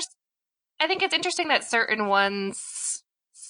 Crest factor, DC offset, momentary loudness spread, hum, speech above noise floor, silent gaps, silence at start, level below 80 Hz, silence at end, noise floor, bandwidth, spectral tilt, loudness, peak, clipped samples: 22 dB; under 0.1%; 9 LU; none; 64 dB; none; 0 s; -76 dBFS; 0 s; -89 dBFS; 10.5 kHz; -1.5 dB/octave; -24 LUFS; -6 dBFS; under 0.1%